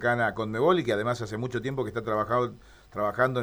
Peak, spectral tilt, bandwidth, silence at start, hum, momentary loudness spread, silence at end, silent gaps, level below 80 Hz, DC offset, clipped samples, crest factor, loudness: -10 dBFS; -6.5 dB/octave; 19.5 kHz; 0 s; none; 8 LU; 0 s; none; -56 dBFS; under 0.1%; under 0.1%; 18 dB; -28 LUFS